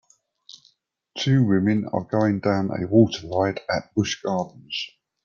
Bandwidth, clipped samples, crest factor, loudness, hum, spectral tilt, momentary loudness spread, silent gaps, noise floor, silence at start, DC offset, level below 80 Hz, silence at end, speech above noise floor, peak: 7.2 kHz; under 0.1%; 18 dB; -23 LUFS; none; -6.5 dB/octave; 11 LU; none; -63 dBFS; 0.5 s; under 0.1%; -60 dBFS; 0.35 s; 41 dB; -4 dBFS